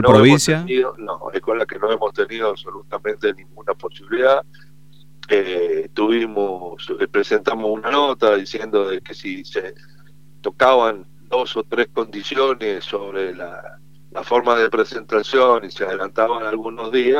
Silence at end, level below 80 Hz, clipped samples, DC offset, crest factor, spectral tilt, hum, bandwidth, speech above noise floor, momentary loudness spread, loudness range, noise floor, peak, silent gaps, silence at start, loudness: 0 s; -54 dBFS; under 0.1%; 0.8%; 20 dB; -5 dB/octave; none; 15 kHz; 31 dB; 14 LU; 3 LU; -49 dBFS; 0 dBFS; none; 0 s; -19 LUFS